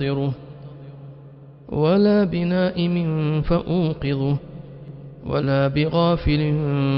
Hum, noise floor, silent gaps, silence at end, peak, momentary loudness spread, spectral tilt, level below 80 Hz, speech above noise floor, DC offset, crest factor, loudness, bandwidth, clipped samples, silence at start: none; -43 dBFS; none; 0 s; -6 dBFS; 21 LU; -7 dB/octave; -38 dBFS; 23 dB; under 0.1%; 16 dB; -21 LUFS; 5.6 kHz; under 0.1%; 0 s